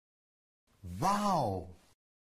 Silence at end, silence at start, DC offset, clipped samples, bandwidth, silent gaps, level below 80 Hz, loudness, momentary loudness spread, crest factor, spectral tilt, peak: 0.55 s; 0.85 s; under 0.1%; under 0.1%; 15 kHz; none; -60 dBFS; -33 LUFS; 22 LU; 18 dB; -5.5 dB/octave; -18 dBFS